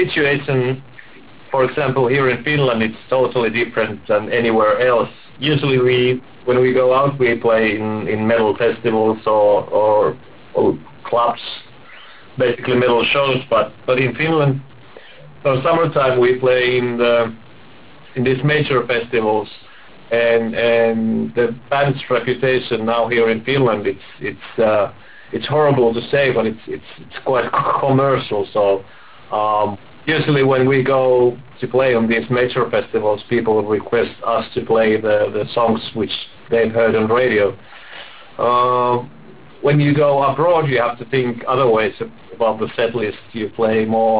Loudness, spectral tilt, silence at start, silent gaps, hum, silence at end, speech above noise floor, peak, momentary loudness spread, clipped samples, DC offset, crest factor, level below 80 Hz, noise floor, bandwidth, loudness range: -17 LUFS; -10 dB/octave; 0 s; none; none; 0 s; 27 dB; -4 dBFS; 10 LU; under 0.1%; 0.8%; 12 dB; -50 dBFS; -43 dBFS; 4 kHz; 2 LU